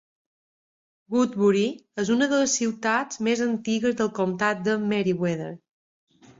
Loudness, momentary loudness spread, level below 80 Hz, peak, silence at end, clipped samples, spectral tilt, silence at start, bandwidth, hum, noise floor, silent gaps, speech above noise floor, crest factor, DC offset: -24 LUFS; 7 LU; -66 dBFS; -8 dBFS; 0.85 s; under 0.1%; -4.5 dB/octave; 1.1 s; 7.8 kHz; none; under -90 dBFS; none; over 66 dB; 16 dB; under 0.1%